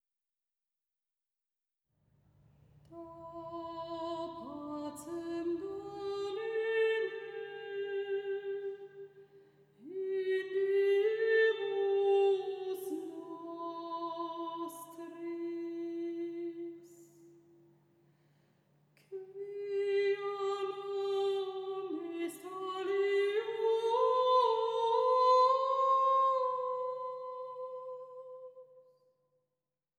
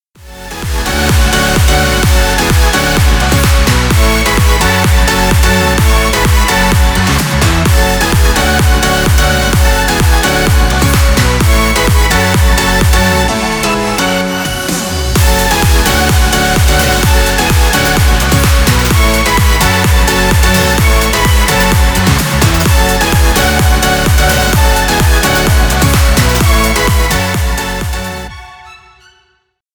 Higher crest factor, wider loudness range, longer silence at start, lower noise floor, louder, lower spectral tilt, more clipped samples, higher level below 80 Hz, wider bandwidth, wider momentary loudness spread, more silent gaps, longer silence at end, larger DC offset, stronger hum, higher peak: first, 18 dB vs 10 dB; first, 15 LU vs 2 LU; first, 2.9 s vs 0.2 s; first, under -90 dBFS vs -58 dBFS; second, -34 LUFS vs -10 LUFS; about the same, -4 dB/octave vs -4 dB/octave; neither; second, -80 dBFS vs -12 dBFS; second, 14 kHz vs over 20 kHz; first, 18 LU vs 3 LU; neither; first, 1.2 s vs 1 s; neither; neither; second, -18 dBFS vs 0 dBFS